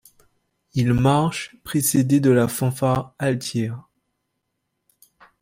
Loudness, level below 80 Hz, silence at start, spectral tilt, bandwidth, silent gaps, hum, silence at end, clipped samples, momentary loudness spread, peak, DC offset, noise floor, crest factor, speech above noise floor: -21 LUFS; -48 dBFS; 0.75 s; -6 dB/octave; 16 kHz; none; none; 1.6 s; under 0.1%; 11 LU; -6 dBFS; under 0.1%; -77 dBFS; 16 dB; 57 dB